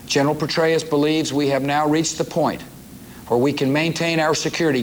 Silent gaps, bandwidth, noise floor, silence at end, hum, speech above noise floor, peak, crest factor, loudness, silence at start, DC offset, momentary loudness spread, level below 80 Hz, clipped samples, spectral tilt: none; over 20 kHz; -39 dBFS; 0 s; none; 20 dB; -6 dBFS; 14 dB; -20 LUFS; 0 s; under 0.1%; 11 LU; -52 dBFS; under 0.1%; -4.5 dB/octave